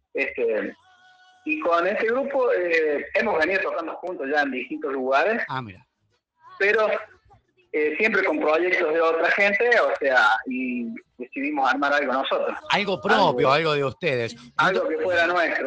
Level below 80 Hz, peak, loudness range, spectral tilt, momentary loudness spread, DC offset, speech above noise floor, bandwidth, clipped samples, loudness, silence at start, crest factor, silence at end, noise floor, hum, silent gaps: -66 dBFS; -6 dBFS; 5 LU; -5 dB/octave; 11 LU; under 0.1%; 49 dB; 8.8 kHz; under 0.1%; -22 LUFS; 0.15 s; 18 dB; 0 s; -72 dBFS; none; none